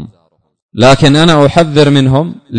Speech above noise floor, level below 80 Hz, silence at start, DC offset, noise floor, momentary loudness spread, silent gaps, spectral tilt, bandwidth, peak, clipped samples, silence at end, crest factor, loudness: 48 dB; -34 dBFS; 0 s; under 0.1%; -55 dBFS; 6 LU; 0.62-0.69 s; -6 dB/octave; 11 kHz; 0 dBFS; 2%; 0 s; 8 dB; -8 LUFS